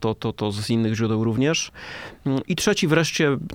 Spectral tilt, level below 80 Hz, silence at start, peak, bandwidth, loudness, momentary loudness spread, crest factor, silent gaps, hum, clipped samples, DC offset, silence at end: -5 dB/octave; -52 dBFS; 0 s; -4 dBFS; 17 kHz; -22 LUFS; 11 LU; 18 dB; none; none; under 0.1%; under 0.1%; 0 s